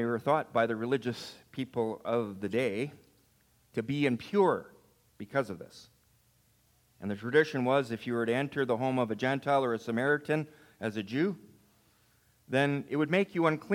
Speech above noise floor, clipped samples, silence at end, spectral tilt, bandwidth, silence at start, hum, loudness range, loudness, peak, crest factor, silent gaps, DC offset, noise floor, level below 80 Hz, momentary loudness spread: 38 dB; under 0.1%; 0 s; -6.5 dB/octave; 16.5 kHz; 0 s; none; 4 LU; -31 LUFS; -10 dBFS; 20 dB; none; under 0.1%; -68 dBFS; -74 dBFS; 12 LU